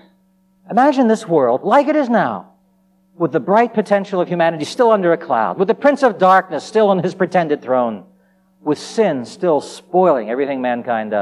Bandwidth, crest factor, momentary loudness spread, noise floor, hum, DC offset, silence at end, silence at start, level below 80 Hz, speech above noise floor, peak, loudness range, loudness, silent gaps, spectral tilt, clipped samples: 12 kHz; 14 dB; 7 LU; -57 dBFS; none; under 0.1%; 0 s; 0.7 s; -72 dBFS; 42 dB; -2 dBFS; 4 LU; -16 LUFS; none; -6.5 dB/octave; under 0.1%